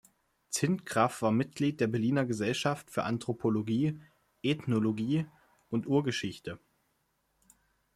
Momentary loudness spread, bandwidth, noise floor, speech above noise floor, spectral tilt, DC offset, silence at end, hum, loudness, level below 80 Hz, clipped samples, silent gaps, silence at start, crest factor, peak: 8 LU; 14.5 kHz; -76 dBFS; 46 dB; -5.5 dB/octave; under 0.1%; 1.4 s; none; -31 LUFS; -68 dBFS; under 0.1%; none; 0.5 s; 20 dB; -12 dBFS